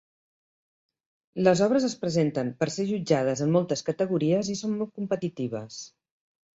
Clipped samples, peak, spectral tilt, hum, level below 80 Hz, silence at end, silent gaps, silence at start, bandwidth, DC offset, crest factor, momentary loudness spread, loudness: under 0.1%; -8 dBFS; -6 dB/octave; none; -66 dBFS; 0.7 s; none; 1.35 s; 8 kHz; under 0.1%; 20 dB; 11 LU; -26 LUFS